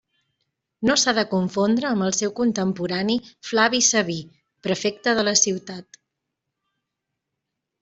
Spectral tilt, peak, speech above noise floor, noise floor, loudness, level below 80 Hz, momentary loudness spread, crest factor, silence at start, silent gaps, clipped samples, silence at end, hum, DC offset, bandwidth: -3 dB/octave; -4 dBFS; 60 dB; -82 dBFS; -21 LUFS; -62 dBFS; 11 LU; 20 dB; 0.8 s; none; under 0.1%; 2 s; none; under 0.1%; 8.2 kHz